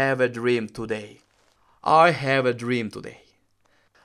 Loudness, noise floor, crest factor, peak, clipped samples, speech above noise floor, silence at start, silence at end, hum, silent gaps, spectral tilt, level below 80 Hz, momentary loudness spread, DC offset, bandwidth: -22 LUFS; -64 dBFS; 22 dB; -2 dBFS; under 0.1%; 42 dB; 0 s; 0.9 s; none; none; -6 dB/octave; -64 dBFS; 16 LU; under 0.1%; 13 kHz